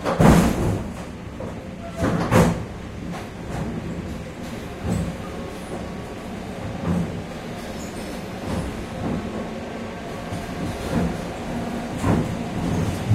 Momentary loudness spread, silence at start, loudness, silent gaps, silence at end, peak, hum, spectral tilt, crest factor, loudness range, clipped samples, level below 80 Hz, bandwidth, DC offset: 14 LU; 0 s; -26 LUFS; none; 0 s; -2 dBFS; none; -6.5 dB/octave; 22 dB; 5 LU; under 0.1%; -36 dBFS; 16 kHz; under 0.1%